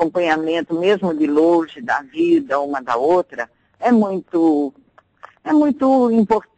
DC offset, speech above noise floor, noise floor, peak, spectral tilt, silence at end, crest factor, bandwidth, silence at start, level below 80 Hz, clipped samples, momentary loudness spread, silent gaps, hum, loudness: under 0.1%; 29 dB; -46 dBFS; -6 dBFS; -7 dB/octave; 0.15 s; 12 dB; 8.6 kHz; 0 s; -58 dBFS; under 0.1%; 8 LU; none; none; -17 LUFS